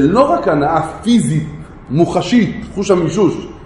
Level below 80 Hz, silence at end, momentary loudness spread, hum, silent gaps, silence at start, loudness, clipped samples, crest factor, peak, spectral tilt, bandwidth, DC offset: -38 dBFS; 0 s; 8 LU; none; none; 0 s; -14 LUFS; under 0.1%; 14 dB; 0 dBFS; -6.5 dB/octave; 11.5 kHz; under 0.1%